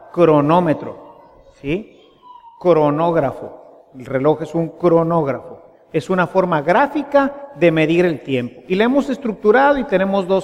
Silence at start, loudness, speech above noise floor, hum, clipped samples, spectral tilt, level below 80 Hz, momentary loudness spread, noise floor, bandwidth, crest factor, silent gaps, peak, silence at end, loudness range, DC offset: 0.15 s; -17 LUFS; 30 dB; none; under 0.1%; -7.5 dB/octave; -50 dBFS; 11 LU; -46 dBFS; 11.5 kHz; 16 dB; none; -2 dBFS; 0 s; 4 LU; under 0.1%